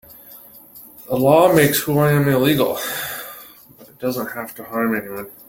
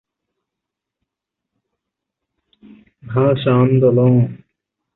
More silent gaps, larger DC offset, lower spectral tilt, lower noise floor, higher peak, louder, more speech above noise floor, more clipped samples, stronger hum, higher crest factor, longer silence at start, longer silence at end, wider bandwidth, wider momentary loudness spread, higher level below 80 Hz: neither; neither; second, -5.5 dB/octave vs -12.5 dB/octave; second, -46 dBFS vs -83 dBFS; first, 0 dBFS vs -4 dBFS; second, -18 LUFS vs -15 LUFS; second, 28 dB vs 69 dB; neither; neither; about the same, 18 dB vs 16 dB; second, 0.1 s vs 3.05 s; second, 0.15 s vs 0.6 s; first, 17 kHz vs 4.1 kHz; first, 23 LU vs 8 LU; about the same, -54 dBFS vs -52 dBFS